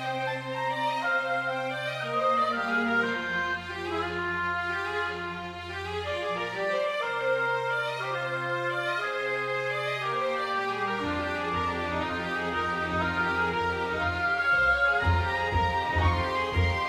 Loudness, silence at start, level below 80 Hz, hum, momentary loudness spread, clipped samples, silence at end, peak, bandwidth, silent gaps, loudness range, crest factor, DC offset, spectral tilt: -28 LUFS; 0 s; -50 dBFS; none; 6 LU; under 0.1%; 0 s; -12 dBFS; 14 kHz; none; 4 LU; 16 dB; under 0.1%; -5.5 dB/octave